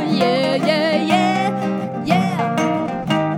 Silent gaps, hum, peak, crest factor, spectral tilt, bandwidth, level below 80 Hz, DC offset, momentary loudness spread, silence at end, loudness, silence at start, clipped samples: none; none; -2 dBFS; 16 dB; -6 dB/octave; 16.5 kHz; -56 dBFS; under 0.1%; 6 LU; 0 s; -18 LUFS; 0 s; under 0.1%